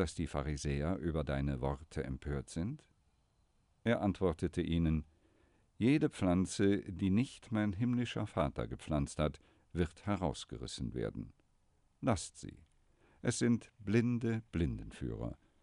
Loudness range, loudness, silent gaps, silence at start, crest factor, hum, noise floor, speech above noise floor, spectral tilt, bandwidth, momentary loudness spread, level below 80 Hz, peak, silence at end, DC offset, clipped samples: 6 LU; -37 LUFS; none; 0 s; 18 dB; none; -73 dBFS; 38 dB; -6.5 dB/octave; 11.5 kHz; 10 LU; -50 dBFS; -18 dBFS; 0.3 s; under 0.1%; under 0.1%